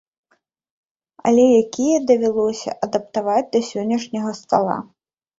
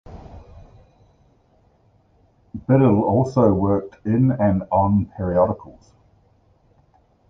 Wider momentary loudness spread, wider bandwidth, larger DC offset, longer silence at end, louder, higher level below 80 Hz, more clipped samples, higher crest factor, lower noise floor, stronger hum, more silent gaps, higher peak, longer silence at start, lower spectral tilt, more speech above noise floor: second, 10 LU vs 17 LU; about the same, 7.8 kHz vs 7.4 kHz; neither; second, 0.55 s vs 1.6 s; about the same, -19 LUFS vs -19 LUFS; second, -62 dBFS vs -42 dBFS; neither; about the same, 18 dB vs 18 dB; first, -66 dBFS vs -58 dBFS; neither; neither; about the same, -2 dBFS vs -4 dBFS; first, 1.25 s vs 0.1 s; second, -5.5 dB/octave vs -10.5 dB/octave; first, 48 dB vs 40 dB